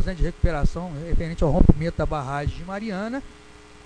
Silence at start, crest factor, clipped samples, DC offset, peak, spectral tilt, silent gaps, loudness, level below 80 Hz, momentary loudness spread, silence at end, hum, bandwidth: 0 s; 22 dB; under 0.1%; under 0.1%; 0 dBFS; -8 dB/octave; none; -25 LUFS; -26 dBFS; 12 LU; 0.1 s; none; 9.4 kHz